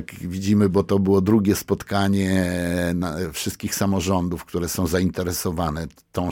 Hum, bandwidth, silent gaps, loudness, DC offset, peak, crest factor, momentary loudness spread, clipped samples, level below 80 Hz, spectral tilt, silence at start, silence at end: none; 17.5 kHz; none; -22 LUFS; under 0.1%; -6 dBFS; 16 dB; 9 LU; under 0.1%; -44 dBFS; -5.5 dB/octave; 0 s; 0 s